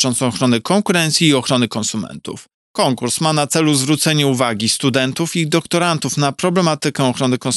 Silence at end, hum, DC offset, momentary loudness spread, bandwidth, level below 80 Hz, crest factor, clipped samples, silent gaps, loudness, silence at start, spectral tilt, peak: 0 s; none; under 0.1%; 7 LU; 12.5 kHz; -60 dBFS; 16 dB; under 0.1%; 2.54-2.74 s; -16 LUFS; 0 s; -4 dB/octave; 0 dBFS